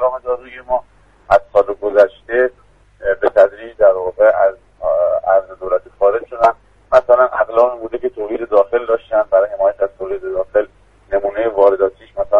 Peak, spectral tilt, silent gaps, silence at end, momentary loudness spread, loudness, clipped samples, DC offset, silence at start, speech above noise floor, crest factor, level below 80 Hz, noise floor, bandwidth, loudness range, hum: 0 dBFS; -6.5 dB/octave; none; 0 s; 10 LU; -16 LUFS; under 0.1%; under 0.1%; 0 s; 33 dB; 16 dB; -46 dBFS; -49 dBFS; 7 kHz; 2 LU; none